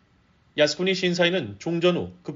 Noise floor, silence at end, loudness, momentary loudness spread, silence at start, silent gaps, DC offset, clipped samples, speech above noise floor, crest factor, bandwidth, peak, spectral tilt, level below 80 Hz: -61 dBFS; 0 s; -23 LUFS; 8 LU; 0.55 s; none; under 0.1%; under 0.1%; 38 dB; 18 dB; 7.6 kHz; -6 dBFS; -3.5 dB/octave; -64 dBFS